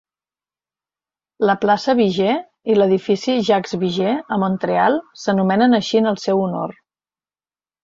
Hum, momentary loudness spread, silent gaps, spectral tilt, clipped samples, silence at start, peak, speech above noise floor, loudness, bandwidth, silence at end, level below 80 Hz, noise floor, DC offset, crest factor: none; 6 LU; none; -6 dB/octave; under 0.1%; 1.4 s; -4 dBFS; over 73 dB; -18 LUFS; 7.6 kHz; 1.1 s; -62 dBFS; under -90 dBFS; under 0.1%; 16 dB